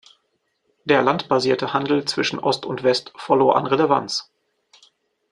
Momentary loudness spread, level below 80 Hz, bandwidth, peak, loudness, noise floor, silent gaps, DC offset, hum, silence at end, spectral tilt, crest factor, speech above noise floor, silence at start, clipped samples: 6 LU; -64 dBFS; 11 kHz; -2 dBFS; -20 LUFS; -71 dBFS; none; under 0.1%; none; 1.1 s; -4.5 dB/octave; 20 dB; 51 dB; 0.85 s; under 0.1%